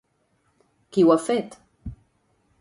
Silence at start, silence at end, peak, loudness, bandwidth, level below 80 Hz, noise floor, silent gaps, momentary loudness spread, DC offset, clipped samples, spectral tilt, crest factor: 0.95 s; 0.65 s; -6 dBFS; -21 LUFS; 11.5 kHz; -52 dBFS; -68 dBFS; none; 23 LU; under 0.1%; under 0.1%; -6.5 dB/octave; 20 dB